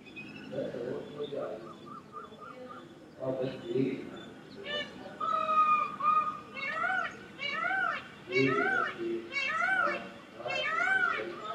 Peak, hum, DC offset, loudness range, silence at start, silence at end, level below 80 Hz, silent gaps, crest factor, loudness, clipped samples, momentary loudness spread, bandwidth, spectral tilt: -14 dBFS; none; under 0.1%; 9 LU; 0 s; 0 s; -72 dBFS; none; 18 dB; -31 LUFS; under 0.1%; 19 LU; 11.5 kHz; -5 dB/octave